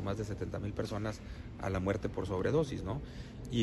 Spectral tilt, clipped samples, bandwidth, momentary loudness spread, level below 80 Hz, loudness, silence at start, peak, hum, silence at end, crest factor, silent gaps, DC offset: -7 dB/octave; under 0.1%; 12.5 kHz; 13 LU; -48 dBFS; -37 LUFS; 0 s; -18 dBFS; none; 0 s; 18 dB; none; under 0.1%